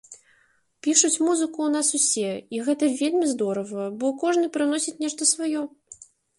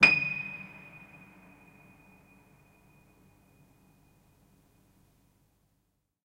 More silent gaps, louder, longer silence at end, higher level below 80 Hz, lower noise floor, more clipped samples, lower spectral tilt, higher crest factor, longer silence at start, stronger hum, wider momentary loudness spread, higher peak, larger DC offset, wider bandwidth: neither; first, -23 LUFS vs -28 LUFS; second, 0.45 s vs 5.45 s; second, -74 dBFS vs -68 dBFS; second, -64 dBFS vs -77 dBFS; neither; about the same, -2.5 dB/octave vs -3 dB/octave; second, 22 dB vs 30 dB; about the same, 0.1 s vs 0 s; neither; second, 9 LU vs 30 LU; about the same, -2 dBFS vs -4 dBFS; neither; second, 11.5 kHz vs 16 kHz